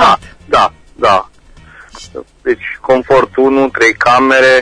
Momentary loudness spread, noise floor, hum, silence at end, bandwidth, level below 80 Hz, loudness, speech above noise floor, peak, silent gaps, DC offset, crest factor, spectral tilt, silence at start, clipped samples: 11 LU; -39 dBFS; none; 0 s; 10.5 kHz; -40 dBFS; -11 LUFS; 29 dB; 0 dBFS; none; under 0.1%; 12 dB; -4 dB/octave; 0 s; under 0.1%